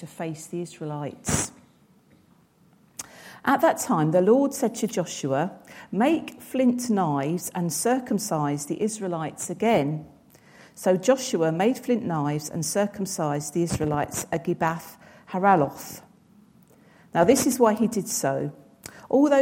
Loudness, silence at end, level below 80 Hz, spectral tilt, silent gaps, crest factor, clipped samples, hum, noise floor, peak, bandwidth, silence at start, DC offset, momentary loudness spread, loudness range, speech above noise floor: -25 LUFS; 0 s; -60 dBFS; -5 dB/octave; none; 20 dB; under 0.1%; none; -59 dBFS; -4 dBFS; 16.5 kHz; 0 s; under 0.1%; 14 LU; 3 LU; 35 dB